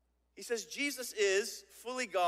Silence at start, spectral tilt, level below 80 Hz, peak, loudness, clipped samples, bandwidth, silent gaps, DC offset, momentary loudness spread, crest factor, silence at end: 0.35 s; -1 dB/octave; -78 dBFS; -18 dBFS; -35 LUFS; under 0.1%; 16 kHz; none; under 0.1%; 12 LU; 18 dB; 0 s